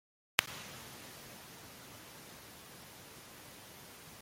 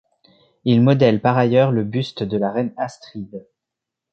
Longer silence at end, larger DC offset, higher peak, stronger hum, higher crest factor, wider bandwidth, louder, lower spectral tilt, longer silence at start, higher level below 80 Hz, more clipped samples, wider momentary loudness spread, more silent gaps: second, 0 s vs 0.75 s; neither; about the same, -4 dBFS vs -2 dBFS; neither; first, 42 dB vs 18 dB; first, 16.5 kHz vs 8 kHz; second, -44 LUFS vs -18 LUFS; second, -1.5 dB/octave vs -8 dB/octave; second, 0.4 s vs 0.65 s; second, -72 dBFS vs -56 dBFS; neither; about the same, 17 LU vs 19 LU; neither